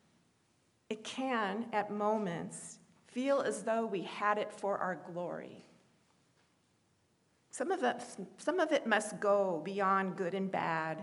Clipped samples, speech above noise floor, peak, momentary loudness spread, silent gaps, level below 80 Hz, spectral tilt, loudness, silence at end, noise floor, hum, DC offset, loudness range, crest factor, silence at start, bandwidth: under 0.1%; 39 dB; -16 dBFS; 13 LU; none; -88 dBFS; -4.5 dB/octave; -35 LUFS; 0 s; -74 dBFS; none; under 0.1%; 8 LU; 20 dB; 0.9 s; 11.5 kHz